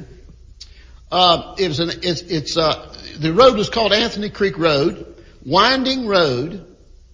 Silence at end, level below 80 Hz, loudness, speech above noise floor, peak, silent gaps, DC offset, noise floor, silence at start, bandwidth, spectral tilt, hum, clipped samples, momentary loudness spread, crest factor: 0.5 s; -42 dBFS; -17 LUFS; 25 dB; 0 dBFS; none; under 0.1%; -42 dBFS; 0 s; 7.6 kHz; -4.5 dB/octave; none; under 0.1%; 12 LU; 18 dB